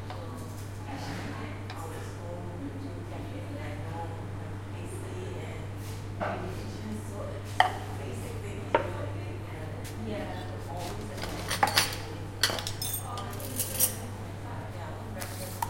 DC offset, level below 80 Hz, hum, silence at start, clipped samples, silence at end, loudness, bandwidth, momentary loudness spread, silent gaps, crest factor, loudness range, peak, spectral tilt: under 0.1%; -50 dBFS; none; 0 s; under 0.1%; 0 s; -34 LUFS; 16.5 kHz; 12 LU; none; 30 dB; 9 LU; -4 dBFS; -3.5 dB/octave